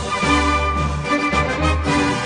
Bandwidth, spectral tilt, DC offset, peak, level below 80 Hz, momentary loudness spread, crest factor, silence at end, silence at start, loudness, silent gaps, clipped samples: 10 kHz; -5 dB/octave; under 0.1%; -4 dBFS; -26 dBFS; 4 LU; 14 dB; 0 s; 0 s; -18 LUFS; none; under 0.1%